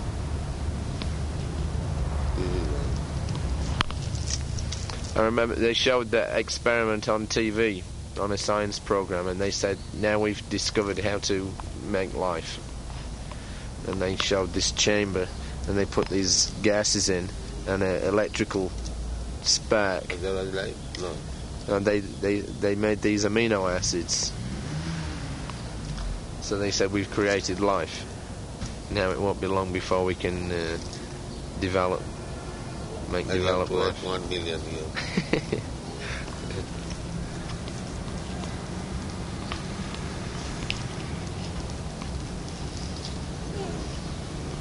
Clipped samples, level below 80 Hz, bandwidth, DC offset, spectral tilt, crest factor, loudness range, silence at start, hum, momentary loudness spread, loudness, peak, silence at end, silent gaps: under 0.1%; -38 dBFS; 11.5 kHz; under 0.1%; -4 dB/octave; 26 dB; 9 LU; 0 s; none; 12 LU; -28 LUFS; -2 dBFS; 0 s; none